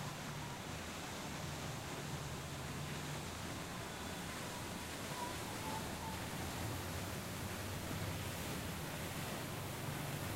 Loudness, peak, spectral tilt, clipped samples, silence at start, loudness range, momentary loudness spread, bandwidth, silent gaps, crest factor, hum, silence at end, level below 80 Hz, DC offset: -44 LUFS; -30 dBFS; -4 dB/octave; under 0.1%; 0 s; 1 LU; 2 LU; 16 kHz; none; 14 dB; none; 0 s; -58 dBFS; under 0.1%